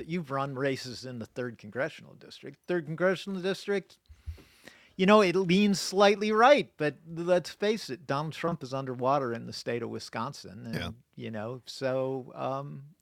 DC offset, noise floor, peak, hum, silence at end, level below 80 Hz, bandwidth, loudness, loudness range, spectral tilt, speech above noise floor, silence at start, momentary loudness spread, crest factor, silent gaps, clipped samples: under 0.1%; -56 dBFS; -8 dBFS; none; 0.1 s; -62 dBFS; 15.5 kHz; -29 LUFS; 9 LU; -5.5 dB/octave; 27 dB; 0 s; 20 LU; 22 dB; none; under 0.1%